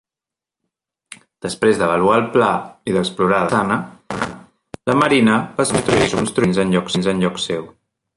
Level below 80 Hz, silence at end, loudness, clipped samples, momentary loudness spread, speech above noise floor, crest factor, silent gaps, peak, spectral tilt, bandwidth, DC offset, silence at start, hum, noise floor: -48 dBFS; 0.5 s; -17 LUFS; under 0.1%; 11 LU; 71 dB; 16 dB; none; -2 dBFS; -5 dB/octave; 11.5 kHz; under 0.1%; 1.45 s; none; -88 dBFS